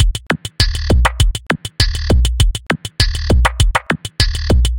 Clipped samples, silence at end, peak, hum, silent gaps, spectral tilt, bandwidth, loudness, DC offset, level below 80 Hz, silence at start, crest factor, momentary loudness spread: under 0.1%; 0 s; 0 dBFS; none; none; -4.5 dB/octave; 17 kHz; -16 LUFS; under 0.1%; -16 dBFS; 0 s; 14 dB; 6 LU